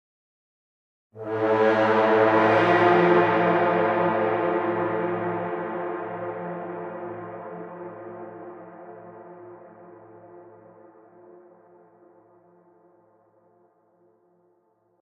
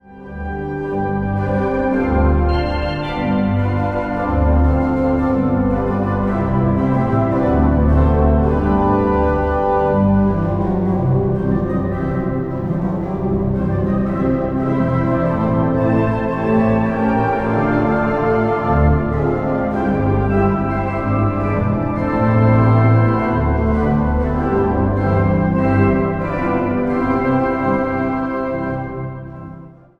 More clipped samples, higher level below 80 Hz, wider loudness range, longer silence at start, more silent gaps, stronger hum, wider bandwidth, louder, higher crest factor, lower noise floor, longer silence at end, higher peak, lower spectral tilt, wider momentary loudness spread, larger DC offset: neither; second, -70 dBFS vs -26 dBFS; first, 22 LU vs 3 LU; first, 1.15 s vs 0.1 s; neither; neither; first, 6.8 kHz vs 5.6 kHz; second, -22 LUFS vs -17 LUFS; first, 20 dB vs 14 dB; first, -66 dBFS vs -37 dBFS; first, 4.5 s vs 0.25 s; second, -6 dBFS vs -2 dBFS; second, -7.5 dB/octave vs -10 dB/octave; first, 25 LU vs 6 LU; neither